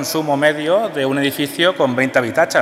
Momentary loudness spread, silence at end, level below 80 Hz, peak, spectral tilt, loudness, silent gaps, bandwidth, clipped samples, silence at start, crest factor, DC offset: 3 LU; 0 s; -64 dBFS; -2 dBFS; -4 dB/octave; -16 LUFS; none; 16 kHz; under 0.1%; 0 s; 16 dB; under 0.1%